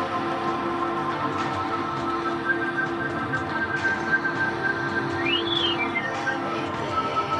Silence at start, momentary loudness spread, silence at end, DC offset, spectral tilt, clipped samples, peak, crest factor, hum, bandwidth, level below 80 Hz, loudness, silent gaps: 0 s; 4 LU; 0 s; under 0.1%; -5 dB/octave; under 0.1%; -10 dBFS; 14 dB; none; 10.5 kHz; -56 dBFS; -25 LUFS; none